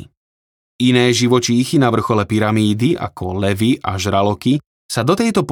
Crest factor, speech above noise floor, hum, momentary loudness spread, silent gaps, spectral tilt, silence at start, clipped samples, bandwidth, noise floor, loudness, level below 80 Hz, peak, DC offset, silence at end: 14 dB; over 75 dB; none; 7 LU; 0.17-0.79 s, 4.66-4.89 s; -5.5 dB/octave; 0 s; under 0.1%; 18 kHz; under -90 dBFS; -16 LUFS; -52 dBFS; -2 dBFS; under 0.1%; 0 s